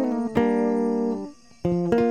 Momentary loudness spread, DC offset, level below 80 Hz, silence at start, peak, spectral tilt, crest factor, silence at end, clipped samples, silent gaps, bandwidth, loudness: 10 LU; 0.2%; -52 dBFS; 0 s; -6 dBFS; -8.5 dB/octave; 16 dB; 0 s; under 0.1%; none; 9.4 kHz; -24 LUFS